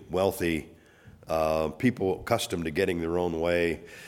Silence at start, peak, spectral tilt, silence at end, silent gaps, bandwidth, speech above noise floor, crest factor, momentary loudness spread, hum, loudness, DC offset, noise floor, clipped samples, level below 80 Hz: 0 s; -8 dBFS; -5.5 dB/octave; 0 s; none; 17.5 kHz; 26 dB; 20 dB; 4 LU; none; -28 LUFS; under 0.1%; -53 dBFS; under 0.1%; -50 dBFS